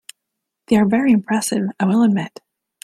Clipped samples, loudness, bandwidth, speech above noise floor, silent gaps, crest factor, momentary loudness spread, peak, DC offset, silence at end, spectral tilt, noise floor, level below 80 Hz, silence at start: under 0.1%; -17 LUFS; 13.5 kHz; 63 dB; none; 16 dB; 7 LU; -2 dBFS; under 0.1%; 0.55 s; -5.5 dB/octave; -80 dBFS; -58 dBFS; 0.7 s